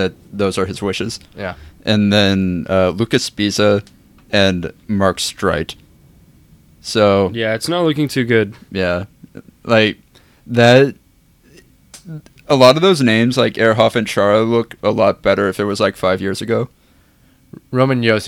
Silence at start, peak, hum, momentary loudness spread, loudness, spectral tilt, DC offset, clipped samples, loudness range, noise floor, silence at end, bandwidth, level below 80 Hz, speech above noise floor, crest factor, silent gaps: 0 s; 0 dBFS; none; 13 LU; -15 LUFS; -5.5 dB/octave; under 0.1%; under 0.1%; 4 LU; -52 dBFS; 0 s; 16.5 kHz; -48 dBFS; 37 dB; 16 dB; none